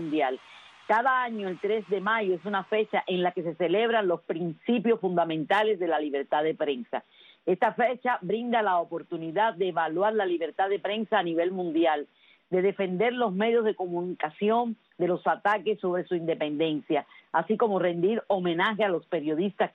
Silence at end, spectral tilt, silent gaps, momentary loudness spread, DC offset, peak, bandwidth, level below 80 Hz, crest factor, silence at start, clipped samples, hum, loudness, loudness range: 0.05 s; -7.5 dB/octave; none; 6 LU; under 0.1%; -12 dBFS; 6.8 kHz; -78 dBFS; 16 dB; 0 s; under 0.1%; none; -27 LUFS; 1 LU